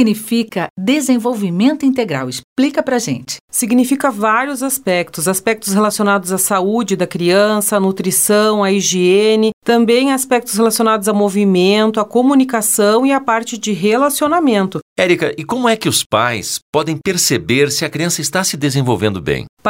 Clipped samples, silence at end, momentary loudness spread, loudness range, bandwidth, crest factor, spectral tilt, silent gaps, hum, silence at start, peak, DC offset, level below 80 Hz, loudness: under 0.1%; 0 s; 6 LU; 3 LU; 16.5 kHz; 14 dB; -4 dB/octave; 0.70-0.76 s, 2.44-2.56 s, 3.40-3.48 s, 9.53-9.62 s, 14.82-14.96 s, 16.06-16.10 s, 16.62-16.73 s, 19.49-19.57 s; none; 0 s; 0 dBFS; 0.1%; -52 dBFS; -14 LUFS